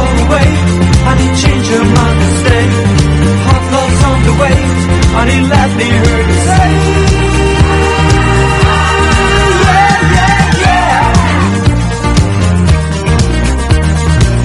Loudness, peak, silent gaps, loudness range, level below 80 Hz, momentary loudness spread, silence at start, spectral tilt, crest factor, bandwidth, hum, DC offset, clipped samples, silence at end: -9 LUFS; 0 dBFS; none; 2 LU; -14 dBFS; 3 LU; 0 s; -5.5 dB/octave; 8 dB; 11.5 kHz; none; under 0.1%; 0.8%; 0 s